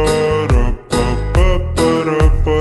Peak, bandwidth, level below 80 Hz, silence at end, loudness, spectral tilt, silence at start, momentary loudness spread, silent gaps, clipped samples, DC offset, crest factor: 0 dBFS; 12 kHz; -16 dBFS; 0 s; -15 LUFS; -6 dB/octave; 0 s; 3 LU; none; under 0.1%; under 0.1%; 12 dB